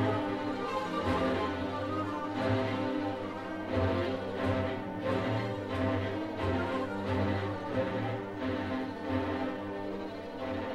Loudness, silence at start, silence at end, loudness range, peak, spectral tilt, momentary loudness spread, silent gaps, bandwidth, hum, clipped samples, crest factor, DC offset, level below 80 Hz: -33 LUFS; 0 s; 0 s; 1 LU; -18 dBFS; -7.5 dB/octave; 6 LU; none; 12.5 kHz; none; under 0.1%; 16 dB; under 0.1%; -56 dBFS